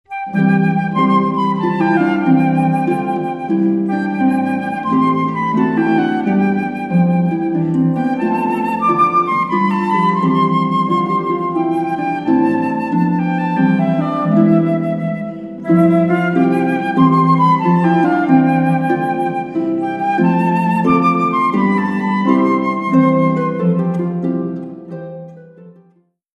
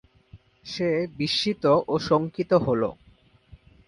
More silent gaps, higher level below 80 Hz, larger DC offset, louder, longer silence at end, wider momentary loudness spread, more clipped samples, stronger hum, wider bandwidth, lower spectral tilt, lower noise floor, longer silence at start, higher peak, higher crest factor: neither; about the same, -56 dBFS vs -56 dBFS; neither; first, -15 LUFS vs -24 LUFS; second, 0.65 s vs 0.95 s; about the same, 7 LU vs 8 LU; neither; neither; second, 6.4 kHz vs 11.5 kHz; first, -9 dB/octave vs -6 dB/octave; about the same, -55 dBFS vs -58 dBFS; second, 0.1 s vs 0.35 s; first, 0 dBFS vs -6 dBFS; second, 14 dB vs 20 dB